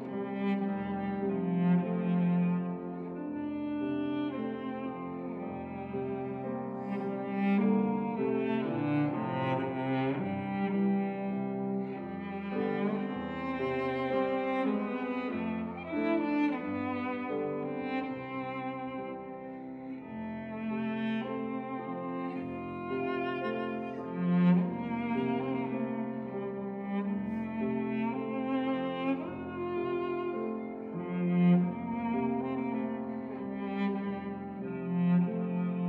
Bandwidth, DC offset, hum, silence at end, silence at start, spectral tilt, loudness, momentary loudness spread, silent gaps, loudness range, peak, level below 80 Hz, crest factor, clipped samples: 4.5 kHz; under 0.1%; none; 0 s; 0 s; -10 dB/octave; -33 LUFS; 10 LU; none; 5 LU; -16 dBFS; -68 dBFS; 16 dB; under 0.1%